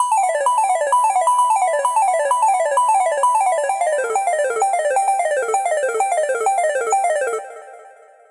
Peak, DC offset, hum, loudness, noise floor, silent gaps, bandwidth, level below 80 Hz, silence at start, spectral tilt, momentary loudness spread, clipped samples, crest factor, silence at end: -6 dBFS; under 0.1%; none; -18 LUFS; -45 dBFS; none; 11.5 kHz; -76 dBFS; 0 s; 1.5 dB/octave; 4 LU; under 0.1%; 12 dB; 0.4 s